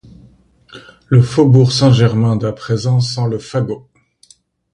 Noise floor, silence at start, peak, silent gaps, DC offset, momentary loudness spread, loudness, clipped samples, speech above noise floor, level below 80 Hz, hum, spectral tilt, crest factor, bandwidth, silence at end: -50 dBFS; 0.75 s; 0 dBFS; none; under 0.1%; 10 LU; -14 LUFS; under 0.1%; 37 dB; -46 dBFS; none; -7 dB/octave; 14 dB; 10 kHz; 0.95 s